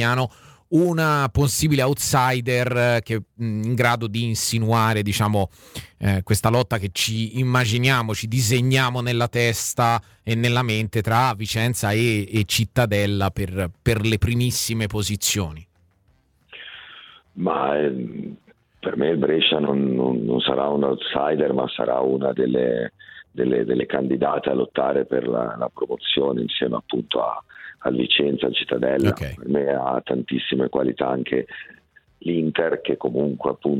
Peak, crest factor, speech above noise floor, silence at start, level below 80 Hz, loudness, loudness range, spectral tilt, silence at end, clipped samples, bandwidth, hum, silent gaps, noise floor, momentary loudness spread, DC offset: -4 dBFS; 18 dB; 40 dB; 0 s; -46 dBFS; -22 LUFS; 4 LU; -5 dB/octave; 0 s; under 0.1%; 19 kHz; none; none; -61 dBFS; 8 LU; under 0.1%